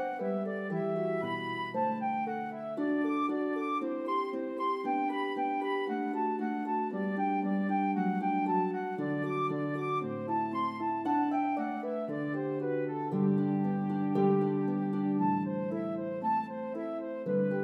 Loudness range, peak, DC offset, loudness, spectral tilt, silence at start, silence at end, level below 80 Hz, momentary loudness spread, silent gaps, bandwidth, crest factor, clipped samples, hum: 2 LU; -16 dBFS; under 0.1%; -32 LUFS; -9 dB/octave; 0 s; 0 s; -86 dBFS; 5 LU; none; 6.2 kHz; 16 dB; under 0.1%; none